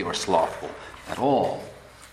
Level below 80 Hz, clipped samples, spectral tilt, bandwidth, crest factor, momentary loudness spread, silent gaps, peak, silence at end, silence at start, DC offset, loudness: -56 dBFS; under 0.1%; -4.5 dB/octave; 14.5 kHz; 20 dB; 18 LU; none; -6 dBFS; 0 s; 0 s; under 0.1%; -25 LUFS